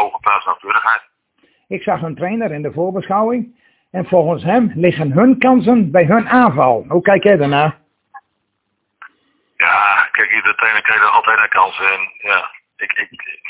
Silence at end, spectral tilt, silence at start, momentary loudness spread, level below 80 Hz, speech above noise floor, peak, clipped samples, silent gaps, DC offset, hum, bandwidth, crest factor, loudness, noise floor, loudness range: 0 s; -10 dB/octave; 0 s; 10 LU; -54 dBFS; 56 dB; 0 dBFS; under 0.1%; none; under 0.1%; none; 4 kHz; 14 dB; -14 LUFS; -70 dBFS; 6 LU